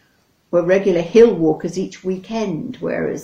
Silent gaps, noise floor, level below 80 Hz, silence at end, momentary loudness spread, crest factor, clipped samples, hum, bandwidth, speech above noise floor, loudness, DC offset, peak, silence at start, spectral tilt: none; -60 dBFS; -50 dBFS; 0 s; 13 LU; 18 dB; under 0.1%; none; 8 kHz; 43 dB; -18 LUFS; under 0.1%; 0 dBFS; 0.5 s; -6.5 dB/octave